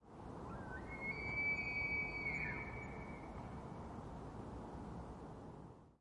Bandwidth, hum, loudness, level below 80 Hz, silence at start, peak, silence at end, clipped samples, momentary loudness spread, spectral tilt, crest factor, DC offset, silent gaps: 11 kHz; none; -44 LUFS; -58 dBFS; 0 s; -30 dBFS; 0.05 s; under 0.1%; 15 LU; -6.5 dB/octave; 16 dB; under 0.1%; none